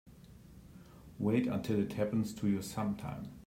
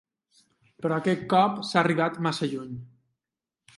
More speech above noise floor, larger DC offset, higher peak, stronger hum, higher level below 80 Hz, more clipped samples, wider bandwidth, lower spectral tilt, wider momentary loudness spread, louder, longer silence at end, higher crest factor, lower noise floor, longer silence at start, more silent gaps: second, 21 dB vs 64 dB; neither; second, -20 dBFS vs -6 dBFS; neither; first, -62 dBFS vs -68 dBFS; neither; first, 16 kHz vs 11.5 kHz; about the same, -7 dB/octave vs -6 dB/octave; first, 23 LU vs 13 LU; second, -35 LUFS vs -26 LUFS; second, 0.05 s vs 0.9 s; second, 16 dB vs 22 dB; second, -56 dBFS vs -89 dBFS; second, 0.05 s vs 0.8 s; neither